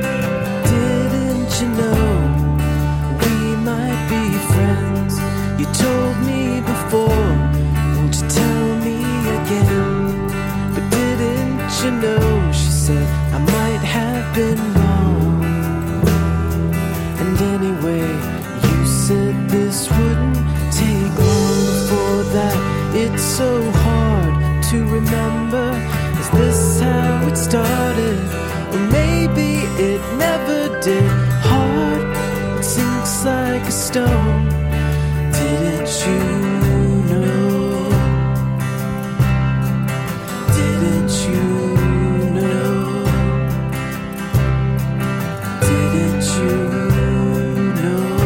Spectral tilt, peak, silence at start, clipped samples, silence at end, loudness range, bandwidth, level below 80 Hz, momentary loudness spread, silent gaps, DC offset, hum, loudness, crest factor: -6 dB/octave; 0 dBFS; 0 s; under 0.1%; 0 s; 2 LU; 17 kHz; -26 dBFS; 4 LU; none; under 0.1%; none; -17 LUFS; 16 dB